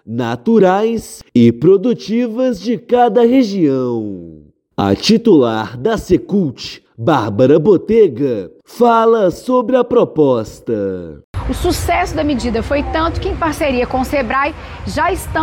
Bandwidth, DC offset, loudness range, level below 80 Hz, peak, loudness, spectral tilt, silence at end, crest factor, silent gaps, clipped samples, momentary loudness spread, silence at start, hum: 17 kHz; under 0.1%; 4 LU; -32 dBFS; 0 dBFS; -14 LUFS; -6.5 dB/octave; 0 s; 14 dB; 11.24-11.34 s; under 0.1%; 12 LU; 0.05 s; none